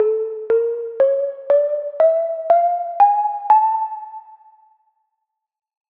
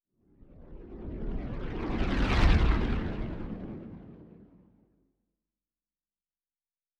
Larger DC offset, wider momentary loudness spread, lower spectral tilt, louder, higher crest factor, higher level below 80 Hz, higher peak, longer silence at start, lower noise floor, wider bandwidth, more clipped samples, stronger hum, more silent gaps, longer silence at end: neither; second, 9 LU vs 24 LU; about the same, -6 dB/octave vs -7 dB/octave; first, -18 LUFS vs -31 LUFS; about the same, 16 dB vs 20 dB; second, -76 dBFS vs -34 dBFS; first, -4 dBFS vs -12 dBFS; second, 0 s vs 0.55 s; second, -78 dBFS vs under -90 dBFS; second, 4.1 kHz vs 8 kHz; neither; neither; neither; second, 1.6 s vs 2.75 s